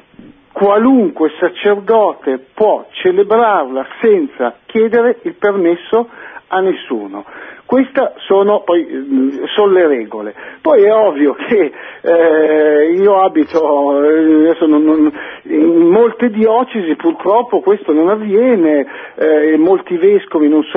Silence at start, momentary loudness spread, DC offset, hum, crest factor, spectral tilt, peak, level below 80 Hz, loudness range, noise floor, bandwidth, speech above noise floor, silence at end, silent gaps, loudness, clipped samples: 0.55 s; 9 LU; under 0.1%; none; 12 dB; -8.5 dB/octave; 0 dBFS; -60 dBFS; 4 LU; -40 dBFS; 3.9 kHz; 29 dB; 0 s; none; -12 LUFS; under 0.1%